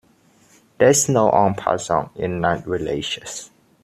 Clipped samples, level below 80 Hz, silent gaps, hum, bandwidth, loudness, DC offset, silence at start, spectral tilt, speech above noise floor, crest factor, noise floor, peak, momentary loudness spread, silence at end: under 0.1%; -52 dBFS; none; none; 14.5 kHz; -19 LUFS; under 0.1%; 0.8 s; -4 dB/octave; 37 dB; 18 dB; -56 dBFS; -2 dBFS; 11 LU; 0.4 s